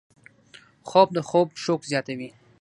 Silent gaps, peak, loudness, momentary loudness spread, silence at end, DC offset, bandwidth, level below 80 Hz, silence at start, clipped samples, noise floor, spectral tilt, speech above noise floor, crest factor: none; -4 dBFS; -23 LUFS; 17 LU; 0.3 s; under 0.1%; 11 kHz; -72 dBFS; 0.85 s; under 0.1%; -53 dBFS; -5.5 dB/octave; 30 dB; 22 dB